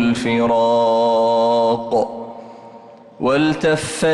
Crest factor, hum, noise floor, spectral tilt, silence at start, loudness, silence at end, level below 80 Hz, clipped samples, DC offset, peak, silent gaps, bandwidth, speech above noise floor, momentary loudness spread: 10 dB; none; -41 dBFS; -5 dB/octave; 0 s; -17 LUFS; 0 s; -52 dBFS; under 0.1%; under 0.1%; -8 dBFS; none; 12 kHz; 24 dB; 10 LU